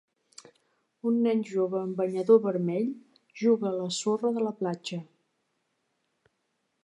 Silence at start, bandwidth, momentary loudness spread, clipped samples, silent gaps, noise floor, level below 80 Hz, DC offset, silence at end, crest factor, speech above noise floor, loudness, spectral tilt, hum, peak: 1.05 s; 11 kHz; 12 LU; under 0.1%; none; -78 dBFS; -84 dBFS; under 0.1%; 1.8 s; 20 dB; 51 dB; -28 LUFS; -6 dB/octave; none; -8 dBFS